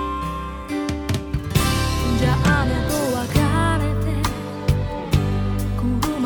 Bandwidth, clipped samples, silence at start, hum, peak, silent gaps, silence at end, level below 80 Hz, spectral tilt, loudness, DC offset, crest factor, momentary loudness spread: over 20 kHz; under 0.1%; 0 s; none; -4 dBFS; none; 0 s; -28 dBFS; -5.5 dB/octave; -21 LUFS; under 0.1%; 16 dB; 7 LU